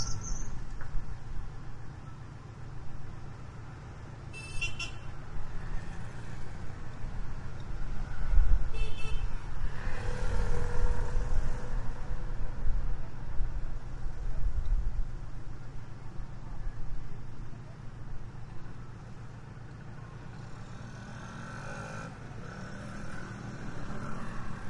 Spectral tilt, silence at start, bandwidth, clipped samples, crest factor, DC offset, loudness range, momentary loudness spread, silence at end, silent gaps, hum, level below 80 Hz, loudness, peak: -5 dB/octave; 0 s; 8.8 kHz; under 0.1%; 20 dB; under 0.1%; 9 LU; 11 LU; 0 s; none; none; -34 dBFS; -41 LUFS; -8 dBFS